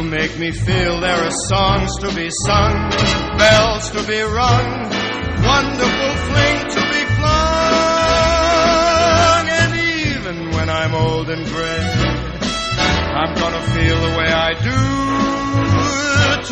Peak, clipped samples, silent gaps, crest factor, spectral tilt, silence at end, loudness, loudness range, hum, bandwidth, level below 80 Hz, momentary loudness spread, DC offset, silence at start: 0 dBFS; under 0.1%; none; 16 dB; -4.5 dB/octave; 0 s; -16 LUFS; 4 LU; none; 9.4 kHz; -28 dBFS; 7 LU; under 0.1%; 0 s